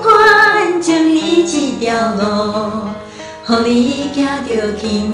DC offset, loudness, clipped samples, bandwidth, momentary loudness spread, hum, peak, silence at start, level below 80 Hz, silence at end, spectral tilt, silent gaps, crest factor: under 0.1%; -13 LUFS; under 0.1%; 11.5 kHz; 14 LU; none; 0 dBFS; 0 s; -44 dBFS; 0 s; -4 dB/octave; none; 14 dB